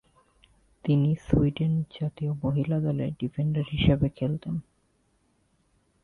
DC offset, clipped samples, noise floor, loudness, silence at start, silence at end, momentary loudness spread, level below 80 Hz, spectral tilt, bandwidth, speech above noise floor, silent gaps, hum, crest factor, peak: under 0.1%; under 0.1%; -69 dBFS; -27 LUFS; 0.85 s; 1.45 s; 9 LU; -44 dBFS; -9.5 dB/octave; 4.3 kHz; 43 dB; none; none; 22 dB; -6 dBFS